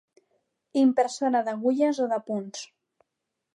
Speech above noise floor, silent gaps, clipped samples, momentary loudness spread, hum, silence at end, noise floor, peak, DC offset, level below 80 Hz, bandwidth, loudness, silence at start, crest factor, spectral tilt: 59 dB; none; under 0.1%; 15 LU; none; 0.9 s; -83 dBFS; -12 dBFS; under 0.1%; -84 dBFS; 10.5 kHz; -25 LUFS; 0.75 s; 16 dB; -5 dB/octave